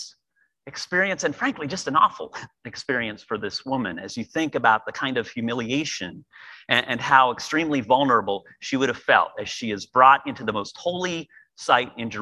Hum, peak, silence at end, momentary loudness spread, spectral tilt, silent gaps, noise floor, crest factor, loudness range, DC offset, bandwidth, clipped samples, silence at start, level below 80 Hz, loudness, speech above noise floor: none; 0 dBFS; 0 s; 15 LU; -4 dB/octave; none; -70 dBFS; 24 dB; 5 LU; under 0.1%; 12 kHz; under 0.1%; 0 s; -62 dBFS; -23 LUFS; 46 dB